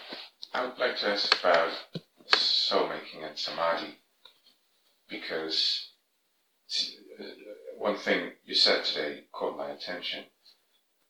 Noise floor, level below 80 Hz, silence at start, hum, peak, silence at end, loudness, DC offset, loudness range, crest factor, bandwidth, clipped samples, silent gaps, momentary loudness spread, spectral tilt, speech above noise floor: -74 dBFS; -84 dBFS; 0 s; none; -2 dBFS; 0.85 s; -28 LUFS; under 0.1%; 6 LU; 28 dB; 19.5 kHz; under 0.1%; none; 20 LU; -2 dB/octave; 44 dB